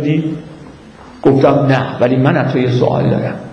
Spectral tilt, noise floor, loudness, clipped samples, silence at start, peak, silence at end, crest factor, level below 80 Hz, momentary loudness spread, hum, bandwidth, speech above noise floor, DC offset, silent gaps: -8.5 dB/octave; -36 dBFS; -13 LUFS; under 0.1%; 0 s; 0 dBFS; 0 s; 14 dB; -46 dBFS; 9 LU; none; 6.6 kHz; 24 dB; under 0.1%; none